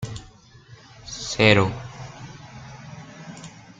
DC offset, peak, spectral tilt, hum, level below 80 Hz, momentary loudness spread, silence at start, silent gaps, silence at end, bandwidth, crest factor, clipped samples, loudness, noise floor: under 0.1%; -2 dBFS; -4.5 dB/octave; none; -50 dBFS; 25 LU; 0 s; none; 0.3 s; 9.4 kHz; 24 dB; under 0.1%; -20 LUFS; -49 dBFS